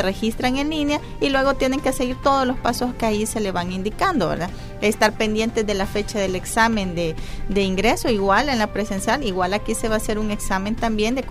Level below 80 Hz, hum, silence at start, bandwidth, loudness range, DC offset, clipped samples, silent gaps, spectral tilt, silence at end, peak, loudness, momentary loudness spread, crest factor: -34 dBFS; none; 0 s; 16 kHz; 1 LU; under 0.1%; under 0.1%; none; -4.5 dB/octave; 0 s; -4 dBFS; -21 LUFS; 5 LU; 16 dB